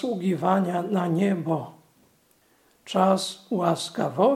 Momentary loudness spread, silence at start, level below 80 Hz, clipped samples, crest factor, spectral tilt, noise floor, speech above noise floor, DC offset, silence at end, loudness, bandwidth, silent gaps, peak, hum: 7 LU; 0 s; -74 dBFS; under 0.1%; 18 dB; -6 dB/octave; -63 dBFS; 39 dB; under 0.1%; 0 s; -25 LUFS; 15 kHz; none; -6 dBFS; none